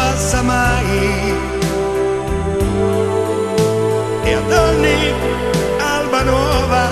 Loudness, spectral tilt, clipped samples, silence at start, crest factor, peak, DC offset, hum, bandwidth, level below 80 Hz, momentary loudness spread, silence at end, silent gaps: -16 LUFS; -5 dB/octave; under 0.1%; 0 s; 14 dB; -2 dBFS; under 0.1%; none; 14 kHz; -26 dBFS; 5 LU; 0 s; none